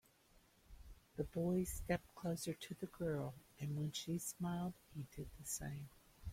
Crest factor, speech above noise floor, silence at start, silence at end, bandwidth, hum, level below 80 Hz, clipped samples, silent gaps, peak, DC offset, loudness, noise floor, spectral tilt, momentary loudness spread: 22 dB; 27 dB; 0.7 s; 0 s; 16.5 kHz; none; -60 dBFS; under 0.1%; none; -24 dBFS; under 0.1%; -45 LUFS; -71 dBFS; -5.5 dB/octave; 13 LU